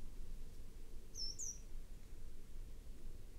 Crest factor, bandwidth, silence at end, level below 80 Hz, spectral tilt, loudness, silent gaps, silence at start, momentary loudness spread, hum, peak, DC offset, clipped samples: 12 dB; 15 kHz; 0 s; -50 dBFS; -2 dB/octave; -52 LUFS; none; 0 s; 14 LU; none; -34 dBFS; under 0.1%; under 0.1%